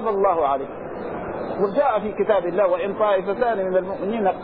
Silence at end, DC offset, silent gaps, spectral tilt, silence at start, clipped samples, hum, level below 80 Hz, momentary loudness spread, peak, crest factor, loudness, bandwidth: 0 s; 0.3%; none; -10 dB/octave; 0 s; under 0.1%; none; -52 dBFS; 10 LU; -6 dBFS; 14 dB; -22 LUFS; 4.7 kHz